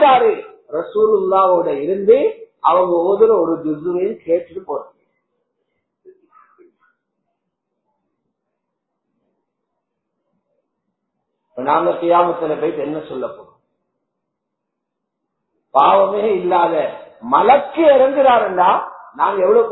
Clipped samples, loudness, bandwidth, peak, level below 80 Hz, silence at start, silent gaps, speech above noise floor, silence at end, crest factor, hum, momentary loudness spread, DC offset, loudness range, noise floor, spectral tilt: under 0.1%; -15 LUFS; 4.1 kHz; 0 dBFS; -62 dBFS; 0 s; none; 63 dB; 0 s; 18 dB; none; 15 LU; under 0.1%; 13 LU; -78 dBFS; -9 dB/octave